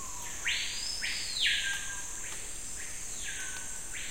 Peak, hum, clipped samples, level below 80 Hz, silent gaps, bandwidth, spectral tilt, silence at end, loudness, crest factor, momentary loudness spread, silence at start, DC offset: -16 dBFS; none; under 0.1%; -52 dBFS; none; 16 kHz; 1 dB/octave; 0 s; -33 LUFS; 20 dB; 11 LU; 0 s; 0.8%